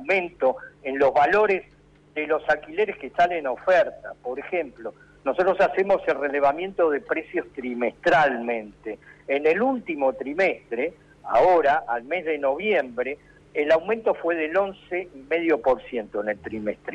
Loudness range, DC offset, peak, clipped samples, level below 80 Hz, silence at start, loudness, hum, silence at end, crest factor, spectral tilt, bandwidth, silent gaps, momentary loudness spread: 2 LU; under 0.1%; -12 dBFS; under 0.1%; -58 dBFS; 0 s; -24 LUFS; none; 0 s; 12 dB; -6 dB/octave; 8.4 kHz; none; 12 LU